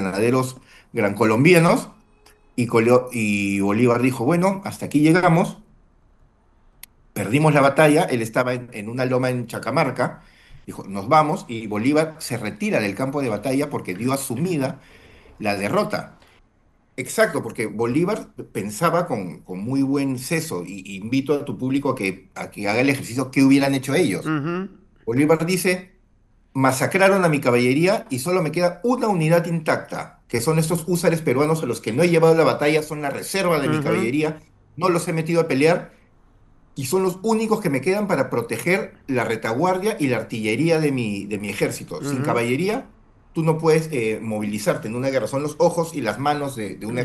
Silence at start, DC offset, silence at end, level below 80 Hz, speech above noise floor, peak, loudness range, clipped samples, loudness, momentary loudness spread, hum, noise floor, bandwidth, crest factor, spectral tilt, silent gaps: 0 s; under 0.1%; 0 s; -56 dBFS; 39 dB; 0 dBFS; 5 LU; under 0.1%; -21 LUFS; 12 LU; none; -59 dBFS; 13 kHz; 20 dB; -6 dB/octave; none